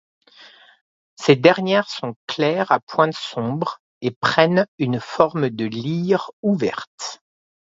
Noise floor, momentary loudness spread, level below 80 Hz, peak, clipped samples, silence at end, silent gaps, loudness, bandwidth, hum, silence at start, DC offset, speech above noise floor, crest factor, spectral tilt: -48 dBFS; 13 LU; -64 dBFS; 0 dBFS; under 0.1%; 0.6 s; 0.81-1.17 s, 2.16-2.27 s, 2.83-2.87 s, 3.80-4.01 s, 4.16-4.21 s, 4.68-4.78 s, 6.33-6.43 s, 6.87-6.98 s; -20 LUFS; 7.8 kHz; none; 0.4 s; under 0.1%; 28 dB; 20 dB; -6 dB/octave